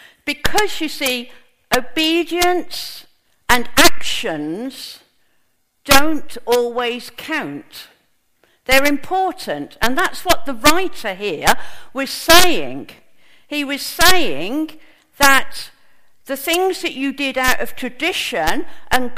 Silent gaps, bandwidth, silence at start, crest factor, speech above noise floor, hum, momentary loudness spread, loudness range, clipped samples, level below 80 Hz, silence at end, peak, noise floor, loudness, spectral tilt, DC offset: none; over 20 kHz; 0 s; 18 dB; 48 dB; none; 17 LU; 4 LU; under 0.1%; -38 dBFS; 0 s; 0 dBFS; -65 dBFS; -17 LUFS; -2 dB/octave; under 0.1%